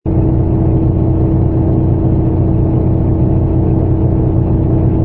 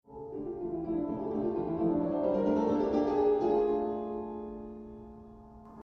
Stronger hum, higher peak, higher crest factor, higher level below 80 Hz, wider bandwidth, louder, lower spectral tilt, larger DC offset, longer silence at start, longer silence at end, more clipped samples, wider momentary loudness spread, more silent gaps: neither; first, 0 dBFS vs -18 dBFS; about the same, 12 dB vs 14 dB; first, -20 dBFS vs -56 dBFS; second, 2.9 kHz vs 6.4 kHz; first, -13 LUFS vs -31 LUFS; first, -14.5 dB/octave vs -9 dB/octave; first, 0.4% vs under 0.1%; about the same, 0.05 s vs 0.1 s; about the same, 0 s vs 0 s; neither; second, 1 LU vs 18 LU; neither